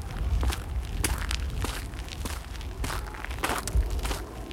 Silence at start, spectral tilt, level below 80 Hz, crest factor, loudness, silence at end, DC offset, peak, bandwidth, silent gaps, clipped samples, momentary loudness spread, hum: 0 s; -4 dB/octave; -32 dBFS; 24 dB; -32 LUFS; 0 s; under 0.1%; -6 dBFS; 16.5 kHz; none; under 0.1%; 7 LU; none